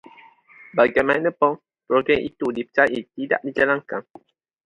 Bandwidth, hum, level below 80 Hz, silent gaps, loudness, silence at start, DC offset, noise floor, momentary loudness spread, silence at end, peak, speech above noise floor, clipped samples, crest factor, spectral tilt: 10.5 kHz; none; -58 dBFS; none; -21 LUFS; 0.75 s; under 0.1%; -50 dBFS; 10 LU; 0.65 s; -2 dBFS; 29 dB; under 0.1%; 20 dB; -6.5 dB/octave